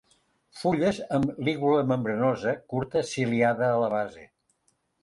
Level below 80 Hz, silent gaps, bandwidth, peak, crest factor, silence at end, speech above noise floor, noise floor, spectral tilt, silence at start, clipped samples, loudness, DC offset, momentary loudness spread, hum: -62 dBFS; none; 11.5 kHz; -12 dBFS; 16 dB; 0.8 s; 46 dB; -72 dBFS; -6.5 dB/octave; 0.55 s; under 0.1%; -26 LUFS; under 0.1%; 6 LU; none